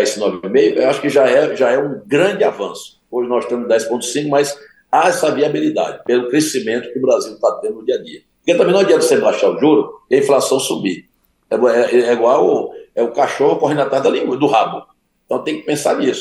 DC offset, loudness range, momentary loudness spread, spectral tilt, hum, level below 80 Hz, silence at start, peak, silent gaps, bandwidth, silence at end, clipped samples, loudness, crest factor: under 0.1%; 3 LU; 9 LU; -4.5 dB/octave; none; -66 dBFS; 0 s; -2 dBFS; none; 12.5 kHz; 0 s; under 0.1%; -15 LUFS; 14 dB